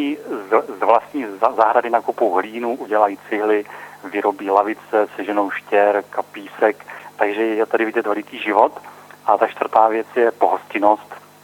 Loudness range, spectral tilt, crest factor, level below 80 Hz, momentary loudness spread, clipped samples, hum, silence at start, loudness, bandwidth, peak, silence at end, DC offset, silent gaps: 2 LU; -5 dB/octave; 18 dB; -70 dBFS; 11 LU; under 0.1%; 50 Hz at -60 dBFS; 0 s; -19 LUFS; 19 kHz; 0 dBFS; 0.25 s; under 0.1%; none